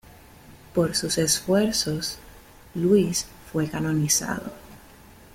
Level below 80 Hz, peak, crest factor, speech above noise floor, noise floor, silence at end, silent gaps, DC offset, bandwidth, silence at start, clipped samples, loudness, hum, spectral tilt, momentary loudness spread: -52 dBFS; -8 dBFS; 18 dB; 25 dB; -49 dBFS; 0.6 s; none; under 0.1%; 16.5 kHz; 0.1 s; under 0.1%; -24 LUFS; none; -4 dB/octave; 11 LU